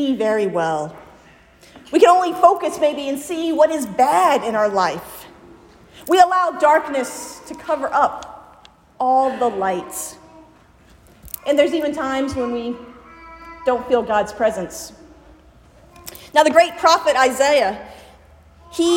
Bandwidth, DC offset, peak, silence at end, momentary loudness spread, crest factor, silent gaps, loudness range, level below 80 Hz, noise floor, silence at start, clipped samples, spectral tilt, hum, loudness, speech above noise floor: 16.5 kHz; under 0.1%; 0 dBFS; 0 s; 19 LU; 18 dB; none; 6 LU; -54 dBFS; -50 dBFS; 0 s; under 0.1%; -3.5 dB/octave; none; -18 LUFS; 32 dB